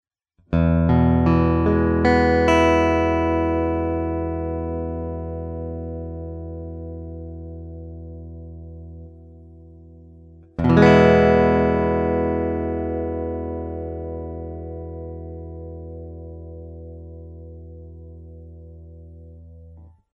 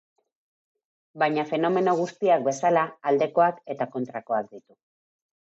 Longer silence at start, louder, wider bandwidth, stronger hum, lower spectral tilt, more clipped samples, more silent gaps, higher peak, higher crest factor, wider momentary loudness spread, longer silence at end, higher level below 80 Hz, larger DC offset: second, 0.5 s vs 1.15 s; first, -20 LUFS vs -25 LUFS; about the same, 7.8 kHz vs 8 kHz; neither; first, -8 dB/octave vs -5.5 dB/octave; neither; neither; first, 0 dBFS vs -8 dBFS; about the same, 22 dB vs 18 dB; first, 24 LU vs 8 LU; second, 0.25 s vs 1 s; first, -34 dBFS vs -80 dBFS; neither